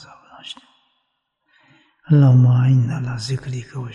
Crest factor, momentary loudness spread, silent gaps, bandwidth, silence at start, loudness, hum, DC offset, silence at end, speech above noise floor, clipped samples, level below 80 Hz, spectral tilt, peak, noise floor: 14 dB; 23 LU; none; 9 kHz; 0.45 s; -17 LUFS; none; under 0.1%; 0 s; 57 dB; under 0.1%; -56 dBFS; -8 dB/octave; -4 dBFS; -72 dBFS